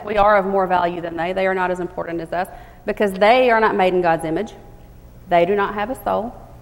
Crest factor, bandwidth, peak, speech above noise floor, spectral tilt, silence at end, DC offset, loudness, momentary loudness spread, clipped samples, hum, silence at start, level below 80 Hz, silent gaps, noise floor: 16 dB; 16.5 kHz; -2 dBFS; 23 dB; -6 dB/octave; 0 s; under 0.1%; -19 LUFS; 12 LU; under 0.1%; none; 0 s; -42 dBFS; none; -42 dBFS